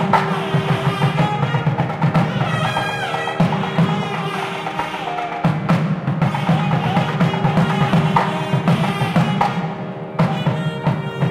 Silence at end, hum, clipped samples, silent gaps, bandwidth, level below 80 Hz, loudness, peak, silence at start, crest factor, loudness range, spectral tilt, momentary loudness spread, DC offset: 0 s; none; under 0.1%; none; 12.5 kHz; -48 dBFS; -19 LUFS; -2 dBFS; 0 s; 18 dB; 3 LU; -7 dB/octave; 6 LU; under 0.1%